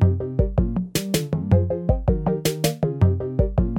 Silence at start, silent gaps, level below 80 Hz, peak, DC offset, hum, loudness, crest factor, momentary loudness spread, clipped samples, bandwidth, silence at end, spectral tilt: 0 s; none; -28 dBFS; -4 dBFS; under 0.1%; none; -22 LUFS; 16 dB; 3 LU; under 0.1%; 16.5 kHz; 0 s; -6.5 dB/octave